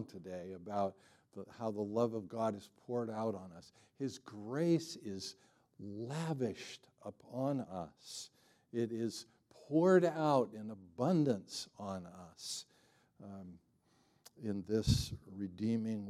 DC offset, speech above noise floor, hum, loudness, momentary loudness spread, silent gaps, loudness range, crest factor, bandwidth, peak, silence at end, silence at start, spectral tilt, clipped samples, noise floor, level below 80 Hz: under 0.1%; 35 dB; none; -38 LUFS; 19 LU; none; 8 LU; 22 dB; 14.5 kHz; -18 dBFS; 0 s; 0 s; -6 dB/octave; under 0.1%; -73 dBFS; -60 dBFS